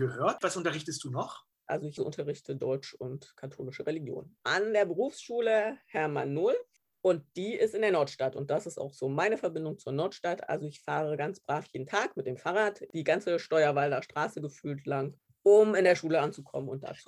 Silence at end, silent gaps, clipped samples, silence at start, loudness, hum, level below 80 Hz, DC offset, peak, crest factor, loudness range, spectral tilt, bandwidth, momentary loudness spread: 0.05 s; none; under 0.1%; 0 s; -31 LUFS; none; -76 dBFS; under 0.1%; -12 dBFS; 20 dB; 7 LU; -5.5 dB/octave; 12 kHz; 11 LU